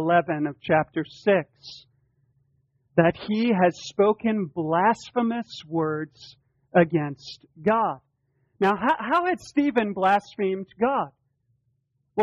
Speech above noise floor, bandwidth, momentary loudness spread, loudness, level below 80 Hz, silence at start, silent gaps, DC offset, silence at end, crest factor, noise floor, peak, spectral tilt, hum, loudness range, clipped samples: 49 dB; 8.4 kHz; 11 LU; -24 LUFS; -64 dBFS; 0 s; none; under 0.1%; 0 s; 20 dB; -72 dBFS; -6 dBFS; -7 dB/octave; none; 2 LU; under 0.1%